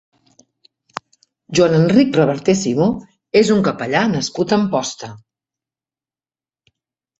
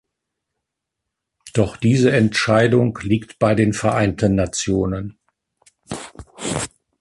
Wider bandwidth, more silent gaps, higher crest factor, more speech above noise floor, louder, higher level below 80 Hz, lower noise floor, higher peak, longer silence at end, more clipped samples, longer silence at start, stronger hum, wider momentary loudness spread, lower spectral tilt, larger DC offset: second, 8.2 kHz vs 11.5 kHz; neither; about the same, 18 dB vs 16 dB; first, over 75 dB vs 64 dB; about the same, -16 LUFS vs -18 LUFS; second, -54 dBFS vs -42 dBFS; first, under -90 dBFS vs -81 dBFS; about the same, -2 dBFS vs -4 dBFS; first, 2.05 s vs 0.35 s; neither; about the same, 1.5 s vs 1.45 s; neither; first, 20 LU vs 17 LU; about the same, -5.5 dB/octave vs -5.5 dB/octave; neither